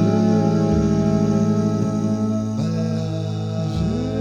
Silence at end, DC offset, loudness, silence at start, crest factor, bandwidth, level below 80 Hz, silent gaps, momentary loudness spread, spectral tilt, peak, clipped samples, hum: 0 s; under 0.1%; -20 LUFS; 0 s; 12 dB; 9.2 kHz; -38 dBFS; none; 7 LU; -8 dB/octave; -6 dBFS; under 0.1%; none